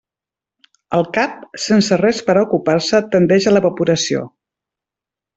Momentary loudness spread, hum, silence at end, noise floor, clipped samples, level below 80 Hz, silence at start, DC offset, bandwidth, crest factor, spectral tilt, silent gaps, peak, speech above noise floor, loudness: 8 LU; none; 1.1 s; -88 dBFS; under 0.1%; -56 dBFS; 0.9 s; under 0.1%; 8.2 kHz; 14 dB; -5 dB/octave; none; -2 dBFS; 74 dB; -16 LUFS